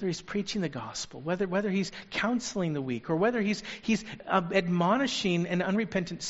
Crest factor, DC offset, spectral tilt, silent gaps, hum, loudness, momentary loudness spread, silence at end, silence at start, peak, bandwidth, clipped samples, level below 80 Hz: 20 dB; under 0.1%; -4.5 dB/octave; none; none; -30 LUFS; 7 LU; 0 s; 0 s; -10 dBFS; 8 kHz; under 0.1%; -60 dBFS